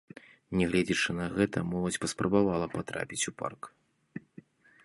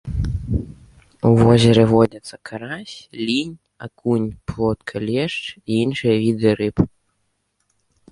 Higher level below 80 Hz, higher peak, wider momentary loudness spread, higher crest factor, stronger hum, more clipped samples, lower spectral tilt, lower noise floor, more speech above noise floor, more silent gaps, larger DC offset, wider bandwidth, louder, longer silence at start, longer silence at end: second, -56 dBFS vs -36 dBFS; second, -12 dBFS vs -2 dBFS; about the same, 20 LU vs 19 LU; about the same, 20 dB vs 18 dB; second, none vs 50 Hz at -55 dBFS; neither; second, -4.5 dB/octave vs -7 dB/octave; second, -55 dBFS vs -70 dBFS; second, 25 dB vs 52 dB; neither; neither; about the same, 11.5 kHz vs 11.5 kHz; second, -30 LUFS vs -19 LUFS; first, 0.5 s vs 0.05 s; second, 0.65 s vs 1.25 s